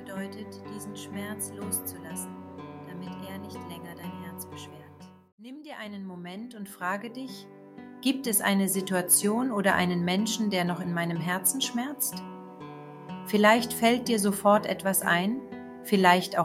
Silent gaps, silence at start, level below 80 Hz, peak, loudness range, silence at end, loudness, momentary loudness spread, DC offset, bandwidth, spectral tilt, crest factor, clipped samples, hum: 5.32-5.38 s; 0 s; -72 dBFS; -6 dBFS; 16 LU; 0 s; -26 LUFS; 21 LU; under 0.1%; 16.5 kHz; -3.5 dB/octave; 24 dB; under 0.1%; none